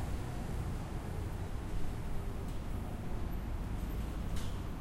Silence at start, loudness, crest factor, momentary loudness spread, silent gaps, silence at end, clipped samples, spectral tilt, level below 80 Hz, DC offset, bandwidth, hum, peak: 0 s; -42 LUFS; 14 dB; 2 LU; none; 0 s; under 0.1%; -6.5 dB/octave; -40 dBFS; under 0.1%; 16 kHz; none; -22 dBFS